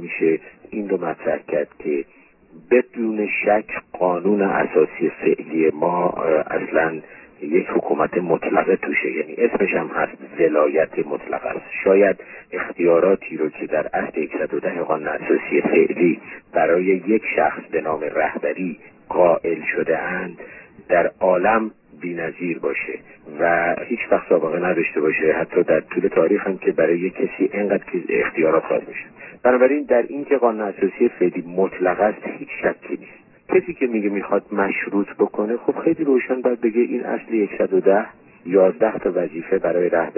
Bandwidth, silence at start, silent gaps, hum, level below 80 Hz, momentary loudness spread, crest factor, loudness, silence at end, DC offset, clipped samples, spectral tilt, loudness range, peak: 3 kHz; 0 s; none; none; -58 dBFS; 9 LU; 18 dB; -20 LUFS; 0 s; under 0.1%; under 0.1%; -10.5 dB/octave; 3 LU; -2 dBFS